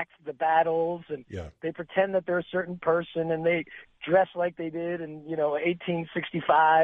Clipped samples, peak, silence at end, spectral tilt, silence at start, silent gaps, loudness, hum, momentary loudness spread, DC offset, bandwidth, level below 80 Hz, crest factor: under 0.1%; -10 dBFS; 0 s; -8 dB/octave; 0 s; none; -28 LUFS; none; 12 LU; under 0.1%; 4.8 kHz; -62 dBFS; 18 dB